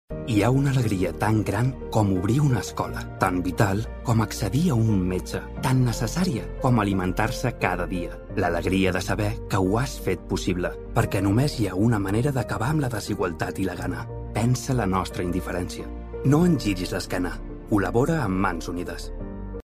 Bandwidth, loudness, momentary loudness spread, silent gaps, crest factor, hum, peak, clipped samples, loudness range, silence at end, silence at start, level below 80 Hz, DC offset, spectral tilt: 15.5 kHz; -25 LUFS; 9 LU; none; 20 dB; none; -4 dBFS; under 0.1%; 2 LU; 0.05 s; 0.1 s; -38 dBFS; under 0.1%; -6.5 dB/octave